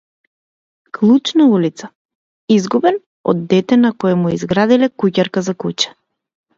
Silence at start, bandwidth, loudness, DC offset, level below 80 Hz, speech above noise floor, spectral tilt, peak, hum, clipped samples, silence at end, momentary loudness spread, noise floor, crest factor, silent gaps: 1 s; 7.8 kHz; -15 LUFS; under 0.1%; -56 dBFS; over 76 dB; -6 dB/octave; 0 dBFS; none; under 0.1%; 0.7 s; 8 LU; under -90 dBFS; 16 dB; 1.95-2.09 s, 2.15-2.48 s, 3.06-3.24 s